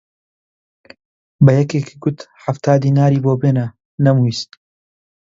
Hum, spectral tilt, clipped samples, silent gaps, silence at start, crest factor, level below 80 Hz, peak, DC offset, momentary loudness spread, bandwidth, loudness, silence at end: none; -8 dB/octave; under 0.1%; 3.85-3.98 s; 1.4 s; 16 dB; -54 dBFS; 0 dBFS; under 0.1%; 13 LU; 7.6 kHz; -16 LUFS; 0.95 s